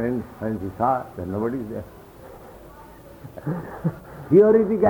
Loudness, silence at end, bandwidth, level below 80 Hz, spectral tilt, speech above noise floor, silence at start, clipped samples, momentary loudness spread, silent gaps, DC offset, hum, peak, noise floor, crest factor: -23 LUFS; 0 s; 19.5 kHz; -50 dBFS; -9.5 dB/octave; 23 dB; 0 s; under 0.1%; 27 LU; none; under 0.1%; none; -6 dBFS; -44 dBFS; 18 dB